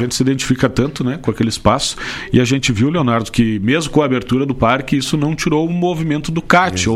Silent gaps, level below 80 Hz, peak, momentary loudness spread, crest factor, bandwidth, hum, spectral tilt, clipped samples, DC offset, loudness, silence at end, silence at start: none; -36 dBFS; 0 dBFS; 5 LU; 16 dB; 15 kHz; none; -5 dB/octave; under 0.1%; under 0.1%; -16 LUFS; 0 s; 0 s